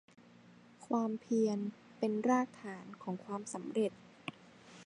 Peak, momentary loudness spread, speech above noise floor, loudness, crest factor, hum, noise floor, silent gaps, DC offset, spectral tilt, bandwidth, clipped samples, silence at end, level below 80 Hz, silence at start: -18 dBFS; 16 LU; 25 dB; -37 LUFS; 18 dB; none; -60 dBFS; none; under 0.1%; -6 dB/octave; 11 kHz; under 0.1%; 0 s; -84 dBFS; 0.8 s